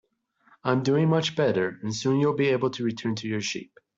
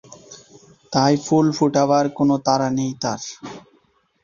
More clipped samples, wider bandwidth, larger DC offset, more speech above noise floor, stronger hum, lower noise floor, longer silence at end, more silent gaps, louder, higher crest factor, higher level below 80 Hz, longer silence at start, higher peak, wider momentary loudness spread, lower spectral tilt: neither; about the same, 7.8 kHz vs 7.4 kHz; neither; about the same, 39 dB vs 42 dB; neither; about the same, -64 dBFS vs -61 dBFS; second, 0.35 s vs 0.65 s; neither; second, -25 LUFS vs -19 LUFS; about the same, 18 dB vs 16 dB; second, -66 dBFS vs -58 dBFS; first, 0.65 s vs 0.1 s; second, -8 dBFS vs -4 dBFS; second, 8 LU vs 13 LU; about the same, -5.5 dB/octave vs -5.5 dB/octave